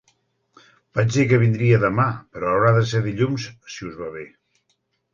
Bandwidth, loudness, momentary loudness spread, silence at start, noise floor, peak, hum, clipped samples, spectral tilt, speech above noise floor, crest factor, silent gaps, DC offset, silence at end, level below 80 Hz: 7.4 kHz; -20 LUFS; 17 LU; 0.95 s; -70 dBFS; -4 dBFS; none; under 0.1%; -7 dB/octave; 51 dB; 18 dB; none; under 0.1%; 0.85 s; -52 dBFS